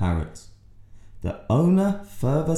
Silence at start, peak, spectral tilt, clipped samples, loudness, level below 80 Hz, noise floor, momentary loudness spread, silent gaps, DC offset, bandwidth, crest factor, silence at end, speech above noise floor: 0 s; -10 dBFS; -8.5 dB/octave; under 0.1%; -24 LUFS; -42 dBFS; -46 dBFS; 14 LU; none; under 0.1%; 13.5 kHz; 14 dB; 0 s; 24 dB